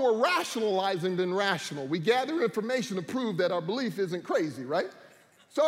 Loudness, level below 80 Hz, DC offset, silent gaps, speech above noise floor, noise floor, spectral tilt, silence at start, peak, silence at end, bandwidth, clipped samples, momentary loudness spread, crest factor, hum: -29 LUFS; -80 dBFS; under 0.1%; none; 29 dB; -58 dBFS; -5 dB/octave; 0 s; -12 dBFS; 0 s; 16 kHz; under 0.1%; 6 LU; 16 dB; none